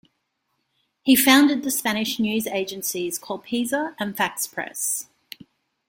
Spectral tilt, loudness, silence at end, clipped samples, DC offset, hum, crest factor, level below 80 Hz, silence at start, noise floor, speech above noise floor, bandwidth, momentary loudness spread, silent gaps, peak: -2.5 dB/octave; -22 LUFS; 0.85 s; under 0.1%; under 0.1%; none; 20 dB; -66 dBFS; 1.05 s; -74 dBFS; 52 dB; 17 kHz; 14 LU; none; -4 dBFS